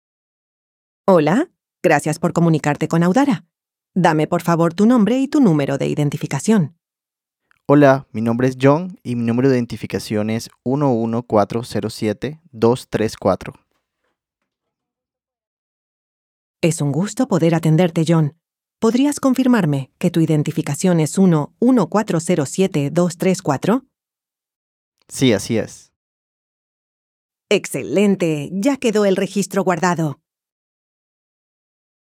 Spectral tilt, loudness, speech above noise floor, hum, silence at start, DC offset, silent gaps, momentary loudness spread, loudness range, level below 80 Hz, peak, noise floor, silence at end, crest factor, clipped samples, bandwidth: -6.5 dB/octave; -18 LUFS; 72 dB; none; 1.05 s; under 0.1%; 15.47-16.54 s, 24.56-24.92 s, 25.96-27.29 s; 8 LU; 7 LU; -58 dBFS; 0 dBFS; -88 dBFS; 1.9 s; 18 dB; under 0.1%; 15.5 kHz